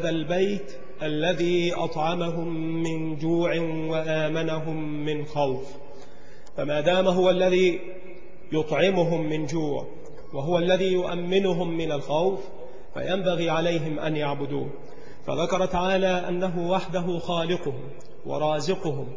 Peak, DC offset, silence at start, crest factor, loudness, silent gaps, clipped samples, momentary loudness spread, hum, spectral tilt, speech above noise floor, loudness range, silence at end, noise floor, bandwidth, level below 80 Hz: -8 dBFS; 3%; 0 s; 18 dB; -26 LUFS; none; under 0.1%; 15 LU; none; -6 dB/octave; 24 dB; 4 LU; 0 s; -49 dBFS; 7.6 kHz; -54 dBFS